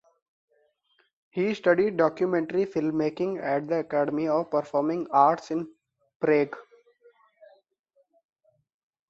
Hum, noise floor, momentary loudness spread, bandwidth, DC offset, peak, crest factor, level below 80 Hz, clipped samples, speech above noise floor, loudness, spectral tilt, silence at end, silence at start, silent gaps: none; -70 dBFS; 10 LU; 7.6 kHz; under 0.1%; -6 dBFS; 22 dB; -72 dBFS; under 0.1%; 45 dB; -26 LUFS; -7.5 dB/octave; 2.5 s; 1.35 s; 6.16-6.20 s